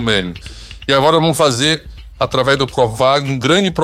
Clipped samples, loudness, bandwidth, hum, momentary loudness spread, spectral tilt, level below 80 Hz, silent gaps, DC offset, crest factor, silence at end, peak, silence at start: under 0.1%; -14 LUFS; 16 kHz; none; 13 LU; -4.5 dB/octave; -38 dBFS; none; under 0.1%; 14 dB; 0 s; -2 dBFS; 0 s